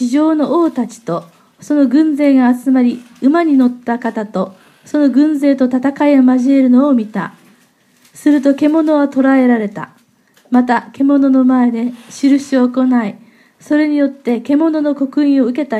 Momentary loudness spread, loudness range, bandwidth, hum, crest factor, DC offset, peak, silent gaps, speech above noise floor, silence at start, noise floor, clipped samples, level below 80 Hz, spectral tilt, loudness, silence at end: 10 LU; 2 LU; 11 kHz; none; 12 dB; under 0.1%; 0 dBFS; none; 40 dB; 0 s; -52 dBFS; under 0.1%; -70 dBFS; -6.5 dB/octave; -13 LUFS; 0 s